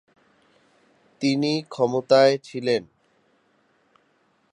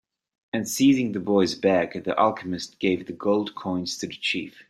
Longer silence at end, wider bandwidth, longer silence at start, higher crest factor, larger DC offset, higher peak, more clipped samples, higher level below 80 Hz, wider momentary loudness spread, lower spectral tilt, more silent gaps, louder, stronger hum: first, 1.7 s vs 0.1 s; second, 10 kHz vs 15.5 kHz; first, 1.2 s vs 0.55 s; about the same, 20 dB vs 18 dB; neither; about the same, -4 dBFS vs -6 dBFS; neither; second, -74 dBFS vs -64 dBFS; about the same, 10 LU vs 10 LU; about the same, -5.5 dB/octave vs -4.5 dB/octave; neither; about the same, -22 LUFS vs -24 LUFS; neither